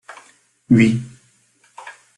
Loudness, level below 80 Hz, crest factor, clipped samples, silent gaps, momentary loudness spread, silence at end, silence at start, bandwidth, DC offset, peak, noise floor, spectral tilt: -16 LUFS; -54 dBFS; 18 dB; under 0.1%; none; 25 LU; 0.25 s; 0.1 s; 11 kHz; under 0.1%; -2 dBFS; -58 dBFS; -7 dB/octave